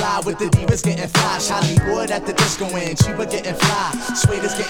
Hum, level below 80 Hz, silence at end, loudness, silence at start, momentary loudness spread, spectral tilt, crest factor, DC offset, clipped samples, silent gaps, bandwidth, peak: none; -36 dBFS; 0 s; -18 LUFS; 0 s; 5 LU; -4.5 dB/octave; 18 dB; under 0.1%; under 0.1%; none; 19 kHz; 0 dBFS